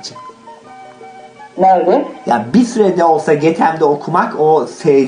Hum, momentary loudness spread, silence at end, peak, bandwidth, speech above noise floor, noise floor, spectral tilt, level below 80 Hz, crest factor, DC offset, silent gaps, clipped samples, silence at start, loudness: none; 6 LU; 0 s; 0 dBFS; 10 kHz; 24 dB; -36 dBFS; -6.5 dB/octave; -60 dBFS; 12 dB; under 0.1%; none; under 0.1%; 0.05 s; -13 LUFS